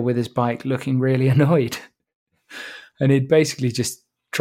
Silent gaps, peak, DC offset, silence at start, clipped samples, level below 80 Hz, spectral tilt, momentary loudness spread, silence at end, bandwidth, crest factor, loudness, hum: 2.15-2.26 s; -4 dBFS; under 0.1%; 0 s; under 0.1%; -62 dBFS; -6 dB/octave; 19 LU; 0 s; 15.5 kHz; 16 dB; -20 LUFS; none